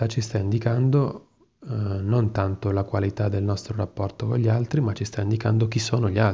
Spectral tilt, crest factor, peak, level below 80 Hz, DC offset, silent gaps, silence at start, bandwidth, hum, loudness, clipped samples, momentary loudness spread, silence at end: -7 dB/octave; 16 dB; -6 dBFS; -44 dBFS; under 0.1%; none; 0 s; 7.8 kHz; none; -24 LUFS; under 0.1%; 7 LU; 0 s